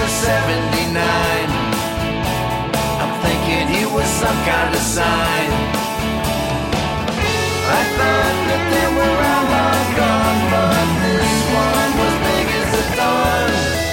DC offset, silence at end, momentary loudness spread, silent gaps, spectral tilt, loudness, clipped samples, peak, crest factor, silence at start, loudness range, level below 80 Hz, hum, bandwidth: under 0.1%; 0 s; 4 LU; none; -4 dB/octave; -17 LUFS; under 0.1%; -4 dBFS; 12 dB; 0 s; 3 LU; -30 dBFS; none; 17 kHz